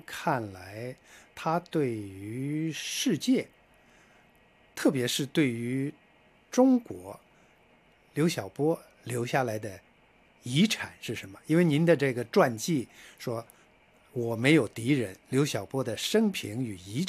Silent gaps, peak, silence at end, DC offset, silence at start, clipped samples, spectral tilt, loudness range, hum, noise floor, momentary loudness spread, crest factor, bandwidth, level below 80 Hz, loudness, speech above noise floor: none; -8 dBFS; 0 s; under 0.1%; 0.1 s; under 0.1%; -5.5 dB/octave; 5 LU; none; -62 dBFS; 17 LU; 20 dB; 15.5 kHz; -70 dBFS; -29 LUFS; 33 dB